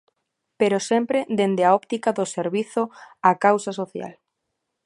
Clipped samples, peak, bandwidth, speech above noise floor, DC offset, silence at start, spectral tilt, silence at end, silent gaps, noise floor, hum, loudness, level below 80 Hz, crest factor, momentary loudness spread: under 0.1%; -2 dBFS; 11.5 kHz; 57 dB; under 0.1%; 0.6 s; -5 dB/octave; 0.75 s; none; -79 dBFS; none; -22 LUFS; -74 dBFS; 20 dB; 12 LU